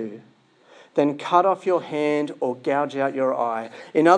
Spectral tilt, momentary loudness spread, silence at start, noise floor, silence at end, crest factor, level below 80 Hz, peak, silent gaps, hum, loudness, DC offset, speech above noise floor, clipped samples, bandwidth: -6 dB/octave; 7 LU; 0 s; -54 dBFS; 0 s; 20 dB; -82 dBFS; -2 dBFS; none; none; -23 LUFS; under 0.1%; 32 dB; under 0.1%; 10 kHz